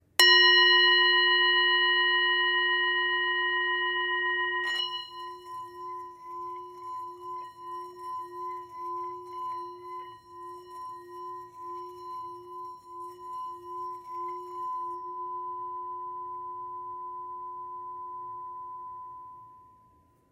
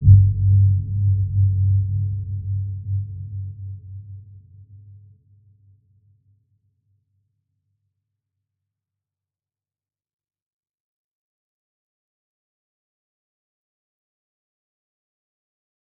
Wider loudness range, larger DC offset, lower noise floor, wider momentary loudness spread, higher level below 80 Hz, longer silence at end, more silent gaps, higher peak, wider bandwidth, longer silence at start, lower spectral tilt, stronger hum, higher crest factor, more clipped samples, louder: second, 18 LU vs 22 LU; neither; second, -63 dBFS vs under -90 dBFS; about the same, 22 LU vs 21 LU; second, -78 dBFS vs -40 dBFS; second, 0.7 s vs 11.2 s; neither; about the same, -4 dBFS vs -2 dBFS; first, 16 kHz vs 0.5 kHz; first, 0.2 s vs 0 s; second, 0 dB/octave vs -18.5 dB/octave; neither; about the same, 26 dB vs 22 dB; neither; second, -24 LUFS vs -20 LUFS